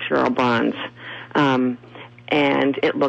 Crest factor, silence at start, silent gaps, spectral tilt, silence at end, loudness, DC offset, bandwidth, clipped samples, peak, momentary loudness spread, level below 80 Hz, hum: 14 dB; 0 s; none; -6.5 dB/octave; 0 s; -20 LUFS; under 0.1%; 8 kHz; under 0.1%; -8 dBFS; 16 LU; -60 dBFS; none